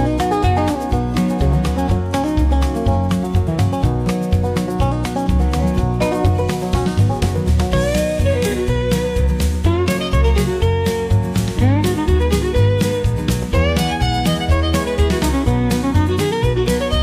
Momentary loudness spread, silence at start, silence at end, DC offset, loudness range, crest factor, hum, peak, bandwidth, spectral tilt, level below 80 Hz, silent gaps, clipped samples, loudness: 3 LU; 0 s; 0 s; under 0.1%; 1 LU; 12 dB; none; -4 dBFS; 15.5 kHz; -6.5 dB/octave; -22 dBFS; none; under 0.1%; -17 LUFS